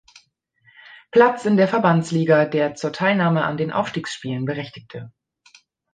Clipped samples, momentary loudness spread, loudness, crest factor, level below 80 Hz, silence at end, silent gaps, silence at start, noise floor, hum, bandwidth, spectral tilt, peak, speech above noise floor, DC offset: under 0.1%; 14 LU; -20 LUFS; 18 dB; -64 dBFS; 0.85 s; none; 1.15 s; -61 dBFS; none; 9.4 kHz; -6.5 dB/octave; -2 dBFS; 42 dB; under 0.1%